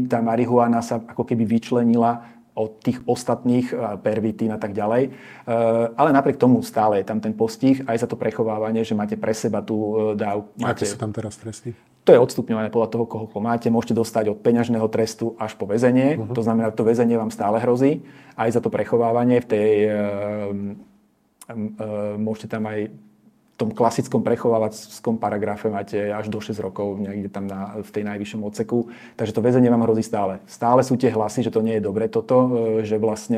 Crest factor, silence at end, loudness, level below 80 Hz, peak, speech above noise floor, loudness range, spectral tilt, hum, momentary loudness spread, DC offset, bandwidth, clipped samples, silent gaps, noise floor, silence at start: 20 dB; 0 s; -21 LUFS; -64 dBFS; 0 dBFS; 39 dB; 6 LU; -7 dB/octave; none; 11 LU; under 0.1%; 15 kHz; under 0.1%; none; -60 dBFS; 0 s